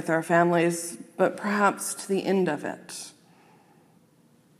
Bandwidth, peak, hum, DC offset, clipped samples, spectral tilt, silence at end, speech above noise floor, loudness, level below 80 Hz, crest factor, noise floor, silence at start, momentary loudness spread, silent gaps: 15.5 kHz; -8 dBFS; none; under 0.1%; under 0.1%; -5 dB/octave; 1.5 s; 35 dB; -25 LUFS; -82 dBFS; 20 dB; -60 dBFS; 0 s; 16 LU; none